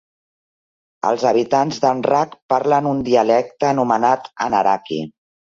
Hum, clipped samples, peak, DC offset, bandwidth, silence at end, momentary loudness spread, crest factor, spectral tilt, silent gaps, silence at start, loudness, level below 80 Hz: none; under 0.1%; -2 dBFS; under 0.1%; 7.6 kHz; 0.5 s; 6 LU; 16 dB; -5.5 dB/octave; 2.42-2.49 s; 1.05 s; -18 LUFS; -58 dBFS